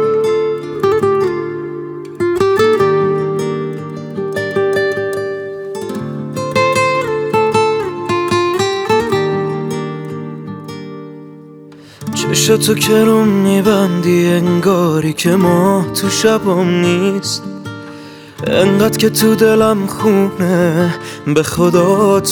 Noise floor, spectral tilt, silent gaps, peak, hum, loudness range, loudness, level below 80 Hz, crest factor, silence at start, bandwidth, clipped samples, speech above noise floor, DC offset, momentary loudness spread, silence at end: -37 dBFS; -5 dB/octave; none; 0 dBFS; none; 6 LU; -14 LUFS; -50 dBFS; 14 dB; 0 s; 19.5 kHz; under 0.1%; 25 dB; under 0.1%; 14 LU; 0 s